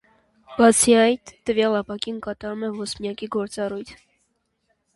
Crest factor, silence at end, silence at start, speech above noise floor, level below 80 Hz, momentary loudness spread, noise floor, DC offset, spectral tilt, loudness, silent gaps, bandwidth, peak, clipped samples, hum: 20 dB; 1 s; 0.5 s; 50 dB; -56 dBFS; 15 LU; -71 dBFS; under 0.1%; -3 dB/octave; -21 LUFS; none; 11.5 kHz; -2 dBFS; under 0.1%; none